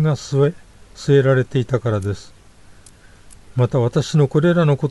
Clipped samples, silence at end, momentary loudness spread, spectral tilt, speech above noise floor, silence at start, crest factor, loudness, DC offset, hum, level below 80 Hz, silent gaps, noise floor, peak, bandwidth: under 0.1%; 0 s; 11 LU; -7.5 dB/octave; 28 dB; 0 s; 14 dB; -18 LUFS; under 0.1%; 50 Hz at -45 dBFS; -48 dBFS; none; -45 dBFS; -4 dBFS; 11.5 kHz